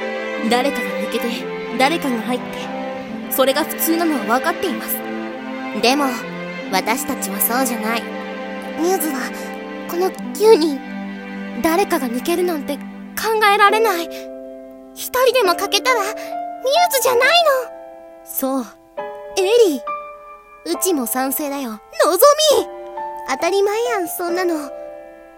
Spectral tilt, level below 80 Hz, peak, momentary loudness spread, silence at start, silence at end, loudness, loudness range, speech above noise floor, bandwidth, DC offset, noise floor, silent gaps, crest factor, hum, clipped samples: -3 dB/octave; -58 dBFS; 0 dBFS; 16 LU; 0 s; 0.05 s; -18 LUFS; 4 LU; 22 dB; 17 kHz; under 0.1%; -40 dBFS; none; 20 dB; none; under 0.1%